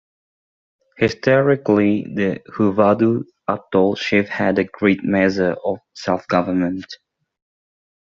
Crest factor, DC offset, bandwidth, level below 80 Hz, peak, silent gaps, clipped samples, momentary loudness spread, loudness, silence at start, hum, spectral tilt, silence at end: 18 dB; under 0.1%; 7.4 kHz; -58 dBFS; 0 dBFS; none; under 0.1%; 10 LU; -18 LUFS; 1 s; none; -5.5 dB/octave; 1.1 s